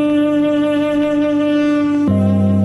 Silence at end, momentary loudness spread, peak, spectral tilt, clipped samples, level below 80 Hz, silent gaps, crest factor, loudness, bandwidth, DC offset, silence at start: 0 s; 2 LU; -4 dBFS; -8 dB/octave; under 0.1%; -48 dBFS; none; 10 dB; -15 LUFS; 11 kHz; under 0.1%; 0 s